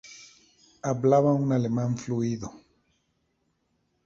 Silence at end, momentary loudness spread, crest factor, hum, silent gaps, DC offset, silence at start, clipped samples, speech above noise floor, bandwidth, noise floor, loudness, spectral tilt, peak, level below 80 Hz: 1.45 s; 14 LU; 20 dB; none; none; under 0.1%; 0.05 s; under 0.1%; 49 dB; 7.6 kHz; -74 dBFS; -26 LUFS; -8 dB/octave; -8 dBFS; -62 dBFS